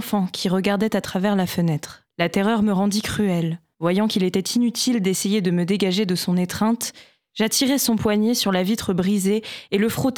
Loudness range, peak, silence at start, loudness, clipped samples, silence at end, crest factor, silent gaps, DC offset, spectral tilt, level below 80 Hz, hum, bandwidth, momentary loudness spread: 1 LU; -6 dBFS; 0 s; -21 LUFS; under 0.1%; 0 s; 14 dB; none; under 0.1%; -5 dB/octave; -54 dBFS; none; 19 kHz; 6 LU